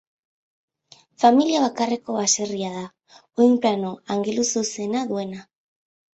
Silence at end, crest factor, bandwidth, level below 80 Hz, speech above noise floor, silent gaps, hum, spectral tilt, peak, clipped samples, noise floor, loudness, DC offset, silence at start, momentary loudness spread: 0.7 s; 20 dB; 8.2 kHz; -68 dBFS; 33 dB; none; none; -3.5 dB/octave; -2 dBFS; under 0.1%; -55 dBFS; -21 LUFS; under 0.1%; 1.2 s; 15 LU